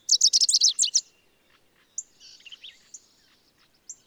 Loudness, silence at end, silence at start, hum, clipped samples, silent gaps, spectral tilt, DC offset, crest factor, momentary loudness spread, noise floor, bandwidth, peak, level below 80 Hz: -19 LUFS; 0.15 s; 0.1 s; none; under 0.1%; none; 5.5 dB/octave; under 0.1%; 20 dB; 27 LU; -64 dBFS; over 20 kHz; -8 dBFS; -80 dBFS